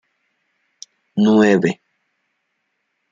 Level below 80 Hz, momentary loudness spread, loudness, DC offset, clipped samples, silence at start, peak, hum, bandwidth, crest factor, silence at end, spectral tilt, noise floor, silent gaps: -66 dBFS; 15 LU; -16 LUFS; under 0.1%; under 0.1%; 1.15 s; -2 dBFS; none; 7.6 kHz; 18 dB; 1.4 s; -6.5 dB/octave; -72 dBFS; none